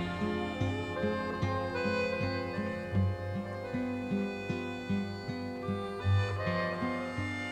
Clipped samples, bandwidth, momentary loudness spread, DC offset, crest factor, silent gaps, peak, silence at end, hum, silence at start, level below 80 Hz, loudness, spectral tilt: under 0.1%; 9.6 kHz; 6 LU; under 0.1%; 14 dB; none; -18 dBFS; 0 s; none; 0 s; -56 dBFS; -34 LUFS; -7 dB/octave